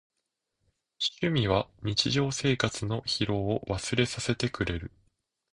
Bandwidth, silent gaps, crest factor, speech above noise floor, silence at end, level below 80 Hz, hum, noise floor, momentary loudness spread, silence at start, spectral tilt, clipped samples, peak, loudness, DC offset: 11 kHz; none; 22 dB; 54 dB; 0.65 s; -50 dBFS; none; -83 dBFS; 6 LU; 1 s; -4.5 dB/octave; under 0.1%; -8 dBFS; -29 LUFS; under 0.1%